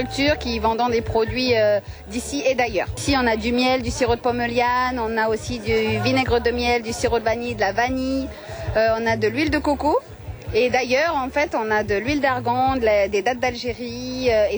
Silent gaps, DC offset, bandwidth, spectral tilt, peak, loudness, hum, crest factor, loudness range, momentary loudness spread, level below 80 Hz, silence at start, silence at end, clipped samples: none; under 0.1%; over 20 kHz; -5 dB/octave; -6 dBFS; -21 LUFS; none; 14 dB; 1 LU; 6 LU; -38 dBFS; 0 s; 0 s; under 0.1%